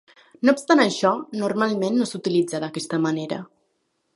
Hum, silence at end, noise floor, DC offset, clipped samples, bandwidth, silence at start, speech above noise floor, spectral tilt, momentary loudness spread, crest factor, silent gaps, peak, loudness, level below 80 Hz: none; 0.7 s; -72 dBFS; under 0.1%; under 0.1%; 11.5 kHz; 0.4 s; 50 dB; -5 dB/octave; 10 LU; 20 dB; none; -4 dBFS; -22 LUFS; -72 dBFS